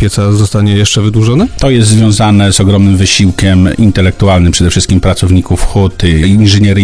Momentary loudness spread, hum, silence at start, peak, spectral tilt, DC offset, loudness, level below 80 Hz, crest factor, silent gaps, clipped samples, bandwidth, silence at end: 3 LU; none; 0 s; 0 dBFS; -5.5 dB/octave; 1%; -8 LUFS; -20 dBFS; 6 dB; none; 1%; 11 kHz; 0 s